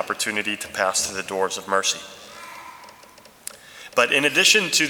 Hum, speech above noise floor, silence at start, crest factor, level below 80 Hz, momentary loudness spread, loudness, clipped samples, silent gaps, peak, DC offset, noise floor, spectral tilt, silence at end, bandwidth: none; 27 dB; 0 s; 22 dB; -64 dBFS; 24 LU; -20 LUFS; under 0.1%; none; -2 dBFS; under 0.1%; -48 dBFS; -1 dB/octave; 0 s; over 20 kHz